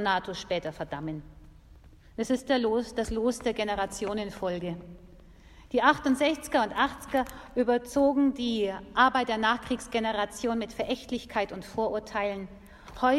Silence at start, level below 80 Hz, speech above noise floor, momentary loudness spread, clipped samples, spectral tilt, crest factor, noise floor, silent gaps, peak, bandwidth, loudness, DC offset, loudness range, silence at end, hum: 0 s; -52 dBFS; 24 dB; 12 LU; under 0.1%; -4.5 dB/octave; 22 dB; -53 dBFS; none; -6 dBFS; 14 kHz; -29 LUFS; under 0.1%; 5 LU; 0 s; none